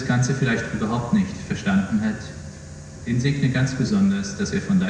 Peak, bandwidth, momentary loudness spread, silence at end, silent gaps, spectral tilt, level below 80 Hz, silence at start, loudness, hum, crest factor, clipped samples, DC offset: -8 dBFS; 10 kHz; 15 LU; 0 s; none; -6 dB/octave; -46 dBFS; 0 s; -22 LUFS; none; 14 dB; under 0.1%; under 0.1%